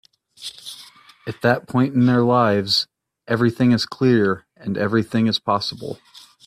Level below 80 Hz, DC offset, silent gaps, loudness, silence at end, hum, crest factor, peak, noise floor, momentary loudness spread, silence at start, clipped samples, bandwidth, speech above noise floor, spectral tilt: -60 dBFS; under 0.1%; none; -19 LUFS; 0.5 s; none; 18 dB; -2 dBFS; -46 dBFS; 18 LU; 0.4 s; under 0.1%; 14.5 kHz; 27 dB; -6 dB/octave